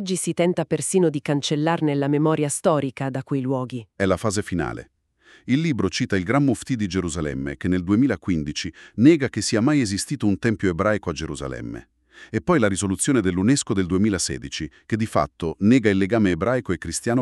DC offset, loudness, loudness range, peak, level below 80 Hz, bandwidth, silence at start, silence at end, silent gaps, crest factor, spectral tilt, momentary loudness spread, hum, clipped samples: under 0.1%; -22 LUFS; 3 LU; -4 dBFS; -48 dBFS; 13 kHz; 0 s; 0 s; none; 18 dB; -5.5 dB/octave; 10 LU; none; under 0.1%